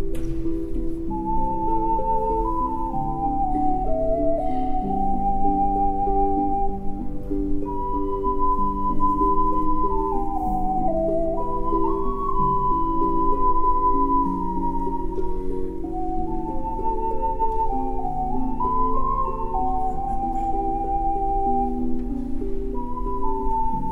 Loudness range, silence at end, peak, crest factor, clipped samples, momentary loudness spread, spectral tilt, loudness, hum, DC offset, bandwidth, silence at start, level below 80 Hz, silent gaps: 3 LU; 0 s; -8 dBFS; 14 dB; under 0.1%; 8 LU; -10 dB/octave; -24 LUFS; none; under 0.1%; 2.7 kHz; 0 s; -28 dBFS; none